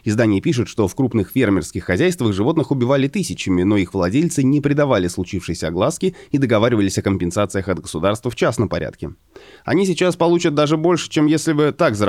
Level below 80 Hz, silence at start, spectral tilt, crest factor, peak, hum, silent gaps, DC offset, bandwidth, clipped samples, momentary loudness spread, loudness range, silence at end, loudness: -46 dBFS; 0.05 s; -6 dB/octave; 14 dB; -4 dBFS; none; none; 0.1%; 15 kHz; under 0.1%; 7 LU; 2 LU; 0 s; -18 LUFS